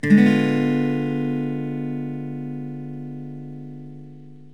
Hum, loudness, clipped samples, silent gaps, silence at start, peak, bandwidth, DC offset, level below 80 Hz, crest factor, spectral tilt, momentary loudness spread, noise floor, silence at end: none; -22 LUFS; under 0.1%; none; 0.05 s; -4 dBFS; 10.5 kHz; 0.5%; -72 dBFS; 18 dB; -8 dB/octave; 21 LU; -43 dBFS; 0.05 s